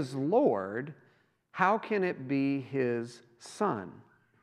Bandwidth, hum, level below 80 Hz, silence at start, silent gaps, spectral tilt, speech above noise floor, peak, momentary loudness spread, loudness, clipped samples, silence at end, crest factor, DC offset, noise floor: 11.5 kHz; none; -84 dBFS; 0 s; none; -7 dB/octave; 30 dB; -10 dBFS; 18 LU; -31 LUFS; under 0.1%; 0.45 s; 22 dB; under 0.1%; -60 dBFS